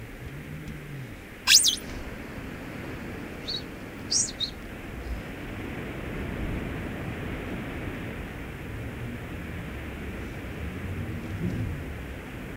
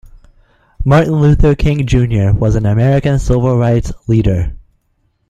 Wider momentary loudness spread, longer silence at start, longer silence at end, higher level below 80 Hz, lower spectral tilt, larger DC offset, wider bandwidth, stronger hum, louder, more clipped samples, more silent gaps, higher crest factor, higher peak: first, 14 LU vs 6 LU; second, 0 s vs 0.8 s; second, 0 s vs 0.7 s; second, -42 dBFS vs -22 dBFS; second, -2.5 dB/octave vs -8 dB/octave; neither; first, 16 kHz vs 9.4 kHz; neither; second, -30 LUFS vs -13 LUFS; neither; neither; first, 28 dB vs 12 dB; second, -4 dBFS vs 0 dBFS